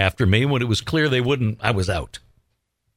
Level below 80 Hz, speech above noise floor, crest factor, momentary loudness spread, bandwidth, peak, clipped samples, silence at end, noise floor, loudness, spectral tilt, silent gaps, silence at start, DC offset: -42 dBFS; 52 dB; 18 dB; 9 LU; 15.5 kHz; -2 dBFS; under 0.1%; 0.8 s; -72 dBFS; -21 LUFS; -6 dB/octave; none; 0 s; under 0.1%